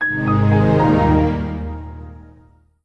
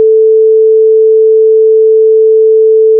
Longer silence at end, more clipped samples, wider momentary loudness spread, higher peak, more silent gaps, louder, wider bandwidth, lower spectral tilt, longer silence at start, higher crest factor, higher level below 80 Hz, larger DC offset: first, 0.65 s vs 0 s; neither; first, 18 LU vs 0 LU; about the same, -4 dBFS vs -2 dBFS; neither; second, -16 LUFS vs -6 LUFS; first, 6.6 kHz vs 0.5 kHz; second, -9.5 dB/octave vs -14 dB/octave; about the same, 0 s vs 0 s; first, 14 dB vs 4 dB; first, -30 dBFS vs under -90 dBFS; neither